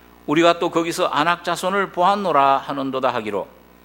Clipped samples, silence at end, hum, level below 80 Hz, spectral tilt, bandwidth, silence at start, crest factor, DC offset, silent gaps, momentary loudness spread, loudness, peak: under 0.1%; 0.4 s; none; -58 dBFS; -4.5 dB/octave; 16.5 kHz; 0.3 s; 20 dB; under 0.1%; none; 9 LU; -19 LUFS; 0 dBFS